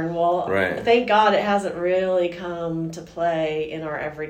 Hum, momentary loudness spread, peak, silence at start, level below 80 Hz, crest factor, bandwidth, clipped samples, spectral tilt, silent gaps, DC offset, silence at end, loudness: none; 11 LU; -4 dBFS; 0 s; -54 dBFS; 18 dB; 15.5 kHz; under 0.1%; -5.5 dB/octave; none; under 0.1%; 0 s; -22 LUFS